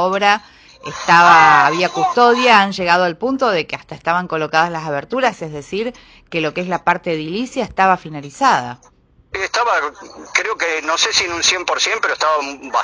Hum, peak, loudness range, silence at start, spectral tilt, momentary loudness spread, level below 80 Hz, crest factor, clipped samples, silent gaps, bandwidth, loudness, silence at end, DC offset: none; 0 dBFS; 8 LU; 0 s; -3 dB/octave; 13 LU; -52 dBFS; 16 dB; under 0.1%; none; 10.5 kHz; -15 LUFS; 0 s; under 0.1%